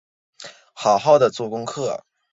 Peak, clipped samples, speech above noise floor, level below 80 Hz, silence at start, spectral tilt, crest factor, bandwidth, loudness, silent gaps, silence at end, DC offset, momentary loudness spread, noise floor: -2 dBFS; under 0.1%; 21 dB; -66 dBFS; 0.4 s; -4.5 dB/octave; 20 dB; 7.8 kHz; -20 LUFS; none; 0.35 s; under 0.1%; 24 LU; -39 dBFS